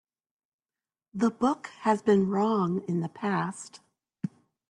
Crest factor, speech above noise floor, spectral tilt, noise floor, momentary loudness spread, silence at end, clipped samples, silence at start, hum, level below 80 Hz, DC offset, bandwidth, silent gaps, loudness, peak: 18 dB; over 63 dB; -7 dB/octave; under -90 dBFS; 15 LU; 0.4 s; under 0.1%; 1.15 s; none; -70 dBFS; under 0.1%; 11 kHz; none; -27 LUFS; -12 dBFS